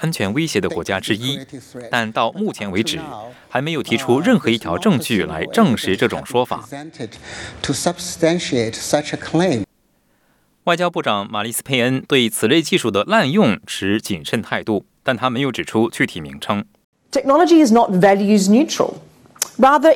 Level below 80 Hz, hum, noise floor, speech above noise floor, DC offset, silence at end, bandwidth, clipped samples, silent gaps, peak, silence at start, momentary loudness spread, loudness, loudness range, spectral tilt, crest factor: -56 dBFS; none; -61 dBFS; 44 dB; under 0.1%; 0 s; 18 kHz; under 0.1%; 16.84-16.93 s; 0 dBFS; 0 s; 12 LU; -18 LUFS; 6 LU; -4.5 dB/octave; 16 dB